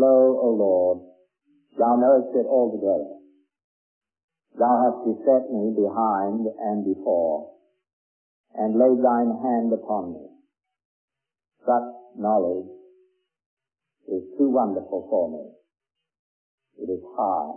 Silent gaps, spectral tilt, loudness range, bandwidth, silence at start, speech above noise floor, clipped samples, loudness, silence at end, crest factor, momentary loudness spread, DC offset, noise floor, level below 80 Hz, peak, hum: 3.64-4.01 s, 4.24-4.28 s, 7.93-8.44 s, 10.85-11.08 s, 13.46-13.57 s, 16.19-16.58 s; -13.5 dB/octave; 5 LU; 2.1 kHz; 0 s; 64 dB; under 0.1%; -23 LUFS; 0 s; 18 dB; 14 LU; under 0.1%; -86 dBFS; -74 dBFS; -6 dBFS; none